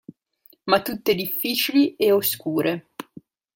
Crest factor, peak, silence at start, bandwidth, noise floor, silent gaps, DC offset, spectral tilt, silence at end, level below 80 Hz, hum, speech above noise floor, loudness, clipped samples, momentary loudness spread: 22 dB; -2 dBFS; 0.65 s; 17 kHz; -58 dBFS; none; under 0.1%; -4 dB/octave; 0.55 s; -66 dBFS; none; 37 dB; -22 LUFS; under 0.1%; 14 LU